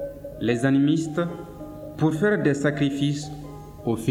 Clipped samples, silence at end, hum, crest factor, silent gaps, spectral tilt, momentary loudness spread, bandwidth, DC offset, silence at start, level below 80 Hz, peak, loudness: under 0.1%; 0 s; none; 16 dB; none; -6.5 dB/octave; 17 LU; 14.5 kHz; under 0.1%; 0 s; -50 dBFS; -8 dBFS; -24 LUFS